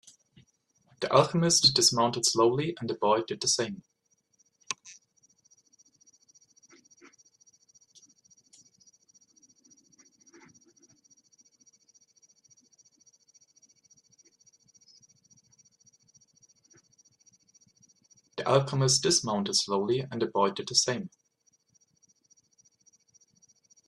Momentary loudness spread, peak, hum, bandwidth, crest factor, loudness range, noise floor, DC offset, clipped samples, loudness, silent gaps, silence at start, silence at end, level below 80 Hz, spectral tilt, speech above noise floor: 17 LU; -6 dBFS; none; 13 kHz; 26 dB; 22 LU; -72 dBFS; under 0.1%; under 0.1%; -26 LUFS; none; 1 s; 2.8 s; -70 dBFS; -3 dB/octave; 45 dB